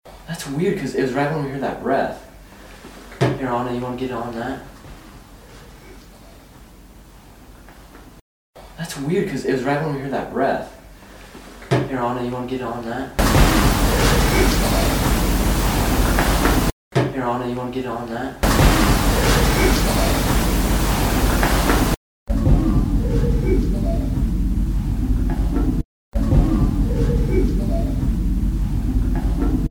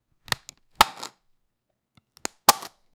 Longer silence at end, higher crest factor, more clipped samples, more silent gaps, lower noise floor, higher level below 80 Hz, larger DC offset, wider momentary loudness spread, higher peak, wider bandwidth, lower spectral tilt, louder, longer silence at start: second, 0 s vs 0.4 s; second, 20 dB vs 28 dB; neither; first, 8.21-8.53 s, 16.72-16.91 s, 21.97-22.26 s, 25.85-26.12 s vs none; second, -43 dBFS vs -78 dBFS; first, -24 dBFS vs -56 dBFS; neither; second, 11 LU vs 17 LU; about the same, 0 dBFS vs 0 dBFS; about the same, over 20 kHz vs over 20 kHz; first, -5.5 dB/octave vs -0.5 dB/octave; first, -20 LUFS vs -23 LUFS; second, 0.05 s vs 0.8 s